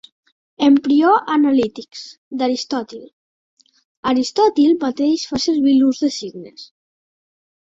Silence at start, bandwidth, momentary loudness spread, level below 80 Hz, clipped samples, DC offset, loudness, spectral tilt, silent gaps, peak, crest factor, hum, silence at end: 0.6 s; 7.8 kHz; 19 LU; -58 dBFS; under 0.1%; under 0.1%; -17 LUFS; -4 dB/octave; 2.18-2.31 s, 3.13-3.57 s, 3.85-4.03 s; -2 dBFS; 16 dB; none; 1.1 s